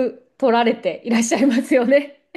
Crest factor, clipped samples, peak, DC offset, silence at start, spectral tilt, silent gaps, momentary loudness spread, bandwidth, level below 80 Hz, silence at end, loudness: 14 dB; under 0.1%; -4 dBFS; under 0.1%; 0 s; -4 dB/octave; none; 6 LU; 12.5 kHz; -68 dBFS; 0.25 s; -18 LUFS